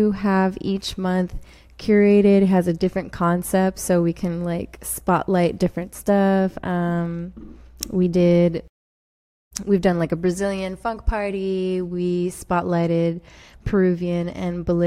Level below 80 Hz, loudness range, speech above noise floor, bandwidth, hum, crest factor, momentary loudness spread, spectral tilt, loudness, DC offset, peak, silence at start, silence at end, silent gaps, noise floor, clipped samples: -40 dBFS; 4 LU; over 70 dB; 15.5 kHz; none; 18 dB; 11 LU; -6.5 dB/octave; -21 LUFS; under 0.1%; -4 dBFS; 0 s; 0 s; 8.69-9.51 s; under -90 dBFS; under 0.1%